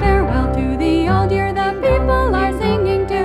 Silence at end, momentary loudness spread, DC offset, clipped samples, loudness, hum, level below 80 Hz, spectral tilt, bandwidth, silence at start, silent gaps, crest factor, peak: 0 s; 3 LU; under 0.1%; under 0.1%; -16 LUFS; none; -22 dBFS; -7.5 dB/octave; 11.5 kHz; 0 s; none; 12 dB; -2 dBFS